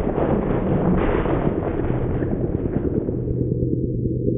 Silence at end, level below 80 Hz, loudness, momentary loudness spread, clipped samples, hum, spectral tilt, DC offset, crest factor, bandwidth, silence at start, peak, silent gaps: 0 s; -30 dBFS; -22 LUFS; 4 LU; under 0.1%; none; -13.5 dB/octave; under 0.1%; 14 dB; 3.8 kHz; 0 s; -6 dBFS; none